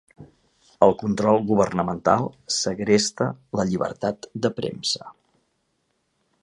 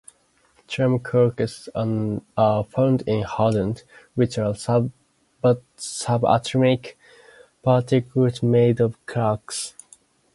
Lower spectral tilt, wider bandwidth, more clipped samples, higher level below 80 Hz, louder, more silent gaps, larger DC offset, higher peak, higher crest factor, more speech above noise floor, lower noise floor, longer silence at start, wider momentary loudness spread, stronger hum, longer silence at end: second, -4.5 dB/octave vs -6.5 dB/octave; about the same, 11 kHz vs 11.5 kHz; neither; about the same, -56 dBFS vs -54 dBFS; about the same, -23 LUFS vs -22 LUFS; neither; neither; about the same, -2 dBFS vs -4 dBFS; about the same, 22 dB vs 18 dB; first, 49 dB vs 40 dB; first, -72 dBFS vs -61 dBFS; second, 0.2 s vs 0.7 s; about the same, 8 LU vs 10 LU; neither; first, 1.3 s vs 0.65 s